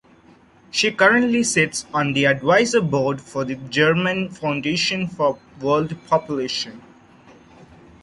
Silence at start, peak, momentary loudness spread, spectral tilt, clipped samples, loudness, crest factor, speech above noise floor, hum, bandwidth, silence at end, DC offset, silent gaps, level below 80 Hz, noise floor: 0.75 s; -2 dBFS; 10 LU; -4 dB/octave; under 0.1%; -20 LUFS; 18 dB; 31 dB; none; 11.5 kHz; 1.25 s; under 0.1%; none; -56 dBFS; -51 dBFS